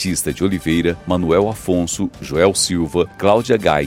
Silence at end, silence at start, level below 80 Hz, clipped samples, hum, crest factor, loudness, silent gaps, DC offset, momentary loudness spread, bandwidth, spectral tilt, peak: 0 s; 0 s; -40 dBFS; under 0.1%; none; 16 dB; -17 LUFS; none; under 0.1%; 5 LU; 17 kHz; -4.5 dB/octave; 0 dBFS